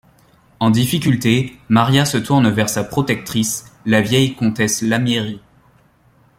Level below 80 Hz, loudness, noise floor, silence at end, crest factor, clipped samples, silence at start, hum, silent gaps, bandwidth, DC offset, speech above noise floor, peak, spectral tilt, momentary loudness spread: -50 dBFS; -17 LUFS; -54 dBFS; 1 s; 16 dB; under 0.1%; 0.6 s; none; none; 16.5 kHz; under 0.1%; 38 dB; 0 dBFS; -5 dB/octave; 6 LU